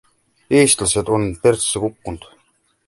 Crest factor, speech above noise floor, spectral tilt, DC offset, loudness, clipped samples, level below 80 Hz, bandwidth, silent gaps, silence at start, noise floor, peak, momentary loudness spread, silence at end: 18 dB; 45 dB; -3.5 dB/octave; under 0.1%; -17 LUFS; under 0.1%; -44 dBFS; 12 kHz; none; 0.5 s; -62 dBFS; -2 dBFS; 18 LU; 0.7 s